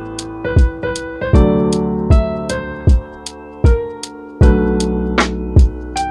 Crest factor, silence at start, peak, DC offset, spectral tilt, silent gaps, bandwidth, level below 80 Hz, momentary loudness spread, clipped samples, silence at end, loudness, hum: 14 dB; 0 s; 0 dBFS; under 0.1%; -6.5 dB/octave; none; 10.5 kHz; -18 dBFS; 14 LU; under 0.1%; 0 s; -16 LUFS; none